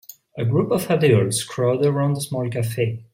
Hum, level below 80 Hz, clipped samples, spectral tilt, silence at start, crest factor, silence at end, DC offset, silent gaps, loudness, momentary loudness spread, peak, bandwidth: none; -58 dBFS; under 0.1%; -6 dB/octave; 0.35 s; 16 dB; 0.1 s; under 0.1%; none; -21 LUFS; 8 LU; -4 dBFS; 16.5 kHz